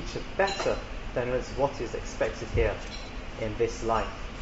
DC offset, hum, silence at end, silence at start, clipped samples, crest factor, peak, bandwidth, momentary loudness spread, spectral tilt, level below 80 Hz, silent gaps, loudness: under 0.1%; none; 0 s; 0 s; under 0.1%; 18 dB; -12 dBFS; 8 kHz; 9 LU; -5 dB/octave; -38 dBFS; none; -31 LUFS